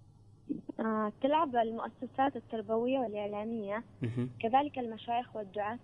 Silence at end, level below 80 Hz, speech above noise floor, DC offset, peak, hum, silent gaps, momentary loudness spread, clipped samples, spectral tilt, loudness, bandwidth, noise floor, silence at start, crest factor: 0 s; -70 dBFS; 23 dB; under 0.1%; -16 dBFS; none; none; 10 LU; under 0.1%; -8.5 dB/octave; -34 LUFS; 9.4 kHz; -56 dBFS; 0.45 s; 18 dB